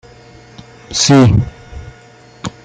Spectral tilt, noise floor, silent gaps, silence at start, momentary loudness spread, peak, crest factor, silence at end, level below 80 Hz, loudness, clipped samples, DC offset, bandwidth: -5 dB/octave; -41 dBFS; none; 0.9 s; 25 LU; 0 dBFS; 16 dB; 0.15 s; -36 dBFS; -11 LUFS; under 0.1%; under 0.1%; 9.6 kHz